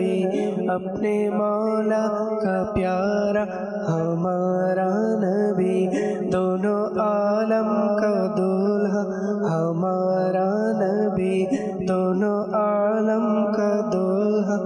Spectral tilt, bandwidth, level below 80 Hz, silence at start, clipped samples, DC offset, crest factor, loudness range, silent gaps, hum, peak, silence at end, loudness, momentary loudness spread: -8 dB/octave; 10 kHz; -56 dBFS; 0 s; under 0.1%; under 0.1%; 10 dB; 1 LU; none; none; -12 dBFS; 0 s; -22 LUFS; 3 LU